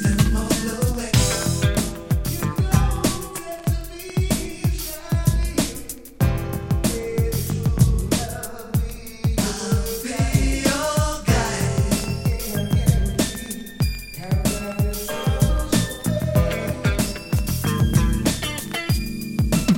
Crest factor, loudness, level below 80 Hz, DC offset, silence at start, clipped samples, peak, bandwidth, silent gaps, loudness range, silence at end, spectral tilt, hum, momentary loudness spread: 18 dB; -22 LUFS; -28 dBFS; under 0.1%; 0 s; under 0.1%; -4 dBFS; 17 kHz; none; 2 LU; 0 s; -5 dB/octave; none; 7 LU